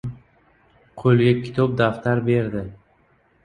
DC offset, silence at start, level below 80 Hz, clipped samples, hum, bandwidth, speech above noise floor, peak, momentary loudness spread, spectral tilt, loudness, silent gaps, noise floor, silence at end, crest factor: under 0.1%; 0.05 s; -50 dBFS; under 0.1%; none; 9.4 kHz; 41 dB; -4 dBFS; 14 LU; -9 dB/octave; -20 LUFS; none; -60 dBFS; 0.7 s; 18 dB